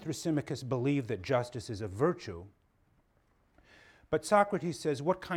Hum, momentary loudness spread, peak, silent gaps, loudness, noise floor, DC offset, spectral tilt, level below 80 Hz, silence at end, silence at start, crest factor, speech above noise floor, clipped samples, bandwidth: none; 12 LU; -12 dBFS; none; -32 LUFS; -70 dBFS; under 0.1%; -6 dB/octave; -64 dBFS; 0 s; 0 s; 22 dB; 38 dB; under 0.1%; 16.5 kHz